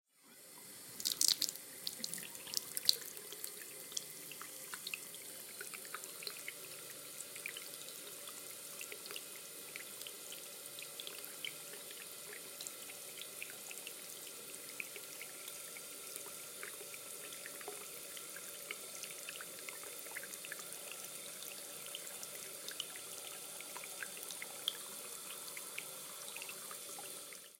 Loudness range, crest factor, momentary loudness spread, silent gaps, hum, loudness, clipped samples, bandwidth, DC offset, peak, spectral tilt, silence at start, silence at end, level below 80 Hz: 8 LU; 38 dB; 6 LU; none; none; -43 LUFS; under 0.1%; 17 kHz; under 0.1%; -8 dBFS; 0.5 dB/octave; 0.15 s; 0 s; under -90 dBFS